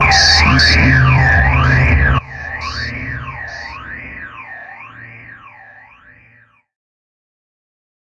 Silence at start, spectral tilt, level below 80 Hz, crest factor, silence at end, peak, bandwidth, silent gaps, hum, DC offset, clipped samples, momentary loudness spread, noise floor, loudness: 0 s; -4 dB/octave; -24 dBFS; 16 dB; 2.65 s; 0 dBFS; 10.5 kHz; none; none; under 0.1%; under 0.1%; 23 LU; -50 dBFS; -11 LUFS